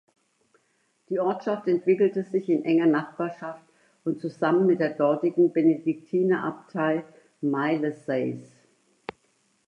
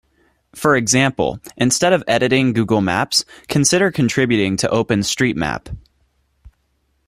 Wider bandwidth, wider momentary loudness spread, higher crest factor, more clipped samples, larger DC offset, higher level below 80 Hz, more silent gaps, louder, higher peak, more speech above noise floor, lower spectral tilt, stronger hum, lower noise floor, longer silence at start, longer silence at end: second, 7 kHz vs 15.5 kHz; first, 14 LU vs 8 LU; about the same, 16 dB vs 18 dB; neither; neither; second, -78 dBFS vs -46 dBFS; neither; second, -25 LUFS vs -17 LUFS; second, -10 dBFS vs -2 dBFS; about the same, 45 dB vs 48 dB; first, -8.5 dB/octave vs -4 dB/octave; neither; first, -70 dBFS vs -65 dBFS; first, 1.1 s vs 0.55 s; about the same, 1.25 s vs 1.3 s